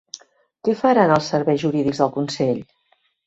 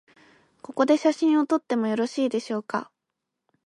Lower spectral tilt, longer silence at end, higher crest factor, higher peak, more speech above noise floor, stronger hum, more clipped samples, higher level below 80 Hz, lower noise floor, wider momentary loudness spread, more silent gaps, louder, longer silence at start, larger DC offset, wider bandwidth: about the same, -6 dB/octave vs -5 dB/octave; second, 0.65 s vs 0.85 s; about the same, 18 dB vs 18 dB; first, -2 dBFS vs -8 dBFS; second, 46 dB vs 60 dB; neither; neither; first, -58 dBFS vs -78 dBFS; second, -64 dBFS vs -83 dBFS; about the same, 12 LU vs 10 LU; neither; first, -20 LUFS vs -24 LUFS; about the same, 0.65 s vs 0.7 s; neither; second, 8 kHz vs 11 kHz